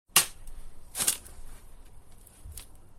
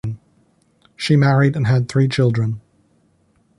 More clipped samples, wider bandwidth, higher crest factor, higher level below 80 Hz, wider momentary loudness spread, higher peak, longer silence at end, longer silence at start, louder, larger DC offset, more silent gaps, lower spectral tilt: neither; first, 17 kHz vs 11 kHz; first, 30 dB vs 16 dB; about the same, -46 dBFS vs -50 dBFS; first, 28 LU vs 16 LU; about the same, -4 dBFS vs -4 dBFS; second, 0 s vs 1 s; about the same, 0.15 s vs 0.05 s; second, -28 LUFS vs -17 LUFS; neither; neither; second, 0.5 dB/octave vs -7 dB/octave